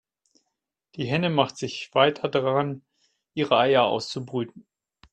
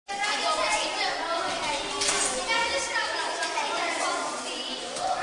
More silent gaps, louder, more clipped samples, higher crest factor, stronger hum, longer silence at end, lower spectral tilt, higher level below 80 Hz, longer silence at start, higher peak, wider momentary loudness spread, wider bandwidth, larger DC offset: neither; first, -24 LUFS vs -27 LUFS; neither; first, 22 dB vs 16 dB; neither; first, 0.55 s vs 0 s; first, -5.5 dB/octave vs 0 dB/octave; second, -66 dBFS vs -58 dBFS; first, 0.95 s vs 0.1 s; first, -4 dBFS vs -12 dBFS; first, 15 LU vs 6 LU; second, 9 kHz vs 11 kHz; neither